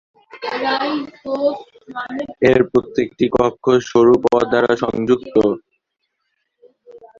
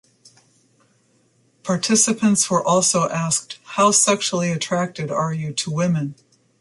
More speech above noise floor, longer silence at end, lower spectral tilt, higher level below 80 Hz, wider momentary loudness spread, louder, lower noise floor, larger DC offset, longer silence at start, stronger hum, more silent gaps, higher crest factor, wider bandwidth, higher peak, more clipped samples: first, 57 dB vs 42 dB; second, 0.2 s vs 0.5 s; first, -6 dB/octave vs -3.5 dB/octave; first, -50 dBFS vs -64 dBFS; first, 14 LU vs 9 LU; about the same, -17 LUFS vs -19 LUFS; first, -74 dBFS vs -61 dBFS; neither; second, 0.35 s vs 1.65 s; neither; neither; about the same, 16 dB vs 18 dB; second, 7.4 kHz vs 11.5 kHz; about the same, -2 dBFS vs -4 dBFS; neither